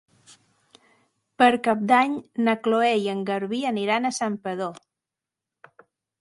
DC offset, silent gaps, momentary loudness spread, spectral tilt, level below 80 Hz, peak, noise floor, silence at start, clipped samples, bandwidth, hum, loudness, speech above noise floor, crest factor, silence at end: under 0.1%; none; 9 LU; -4.5 dB/octave; -74 dBFS; -2 dBFS; -88 dBFS; 1.4 s; under 0.1%; 11.5 kHz; none; -23 LUFS; 65 dB; 22 dB; 1.45 s